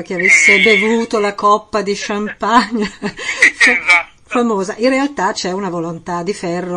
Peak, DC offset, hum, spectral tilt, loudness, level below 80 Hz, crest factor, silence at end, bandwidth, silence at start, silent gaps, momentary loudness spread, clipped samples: 0 dBFS; under 0.1%; none; -3 dB/octave; -13 LUFS; -50 dBFS; 14 dB; 0 s; 12 kHz; 0 s; none; 13 LU; under 0.1%